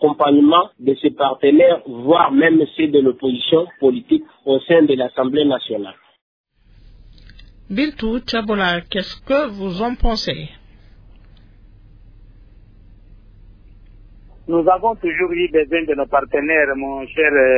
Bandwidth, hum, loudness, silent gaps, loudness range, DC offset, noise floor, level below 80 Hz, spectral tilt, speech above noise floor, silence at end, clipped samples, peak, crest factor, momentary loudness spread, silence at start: 5.4 kHz; none; -17 LUFS; 6.21-6.44 s; 10 LU; under 0.1%; -47 dBFS; -36 dBFS; -6.5 dB/octave; 31 dB; 0 s; under 0.1%; -2 dBFS; 16 dB; 11 LU; 0 s